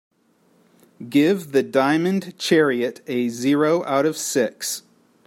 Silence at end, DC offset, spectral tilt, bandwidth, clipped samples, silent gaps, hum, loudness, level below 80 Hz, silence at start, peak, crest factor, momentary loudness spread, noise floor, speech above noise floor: 0.5 s; under 0.1%; -4.5 dB/octave; 16.5 kHz; under 0.1%; none; none; -21 LUFS; -70 dBFS; 1 s; -4 dBFS; 18 dB; 7 LU; -60 dBFS; 40 dB